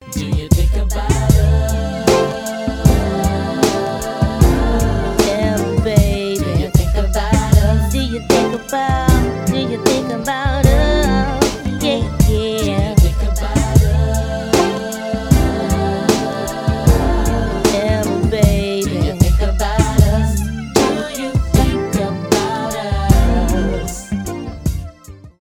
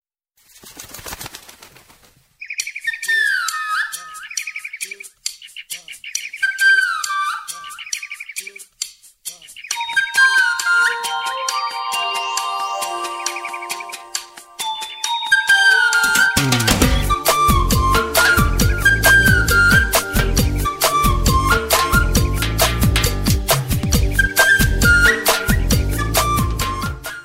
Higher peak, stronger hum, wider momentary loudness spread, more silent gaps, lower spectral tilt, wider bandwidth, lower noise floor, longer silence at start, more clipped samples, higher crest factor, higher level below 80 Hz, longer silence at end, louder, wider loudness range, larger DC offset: about the same, 0 dBFS vs 0 dBFS; neither; second, 7 LU vs 17 LU; neither; first, -6 dB/octave vs -3 dB/octave; about the same, 16.5 kHz vs 16.5 kHz; second, -38 dBFS vs -59 dBFS; second, 0 s vs 0.65 s; neither; about the same, 14 dB vs 18 dB; first, -20 dBFS vs -26 dBFS; about the same, 0.1 s vs 0 s; about the same, -16 LUFS vs -16 LUFS; second, 1 LU vs 9 LU; neither